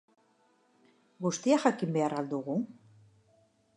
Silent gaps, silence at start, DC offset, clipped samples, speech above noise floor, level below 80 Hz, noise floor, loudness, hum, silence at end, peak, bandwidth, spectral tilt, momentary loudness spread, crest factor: none; 1.2 s; under 0.1%; under 0.1%; 39 dB; -84 dBFS; -69 dBFS; -31 LUFS; none; 1.05 s; -10 dBFS; 11 kHz; -5.5 dB/octave; 9 LU; 24 dB